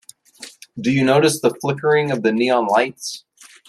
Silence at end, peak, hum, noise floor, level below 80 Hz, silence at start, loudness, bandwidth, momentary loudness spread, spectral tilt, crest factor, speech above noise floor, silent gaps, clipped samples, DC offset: 0.5 s; -4 dBFS; none; -42 dBFS; -62 dBFS; 0.4 s; -18 LUFS; 14 kHz; 20 LU; -5 dB/octave; 16 dB; 25 dB; none; under 0.1%; under 0.1%